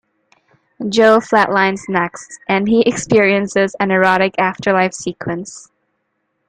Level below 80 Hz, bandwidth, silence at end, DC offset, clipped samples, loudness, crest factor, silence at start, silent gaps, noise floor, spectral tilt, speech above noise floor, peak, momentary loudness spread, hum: -54 dBFS; 10 kHz; 0.85 s; under 0.1%; under 0.1%; -15 LUFS; 16 dB; 0.8 s; none; -69 dBFS; -5 dB/octave; 54 dB; 0 dBFS; 12 LU; none